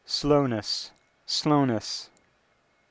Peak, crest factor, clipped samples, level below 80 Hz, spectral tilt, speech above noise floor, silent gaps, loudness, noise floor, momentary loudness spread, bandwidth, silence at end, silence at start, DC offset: -8 dBFS; 20 dB; under 0.1%; -54 dBFS; -5 dB/octave; 42 dB; none; -26 LUFS; -67 dBFS; 13 LU; 8 kHz; 0.85 s; 0.1 s; under 0.1%